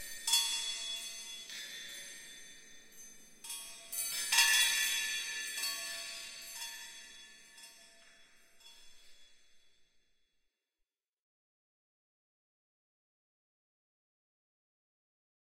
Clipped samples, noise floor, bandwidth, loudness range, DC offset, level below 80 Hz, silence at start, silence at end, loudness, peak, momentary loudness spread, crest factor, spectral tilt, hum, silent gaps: under 0.1%; -88 dBFS; 16 kHz; 17 LU; under 0.1%; -76 dBFS; 0 s; 5.65 s; -33 LUFS; -14 dBFS; 26 LU; 28 dB; 4 dB/octave; none; none